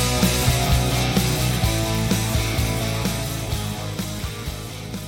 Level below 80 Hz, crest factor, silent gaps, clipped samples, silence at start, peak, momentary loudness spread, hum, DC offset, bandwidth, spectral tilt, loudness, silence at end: -30 dBFS; 16 dB; none; under 0.1%; 0 s; -6 dBFS; 10 LU; none; under 0.1%; 18 kHz; -4.5 dB/octave; -22 LUFS; 0 s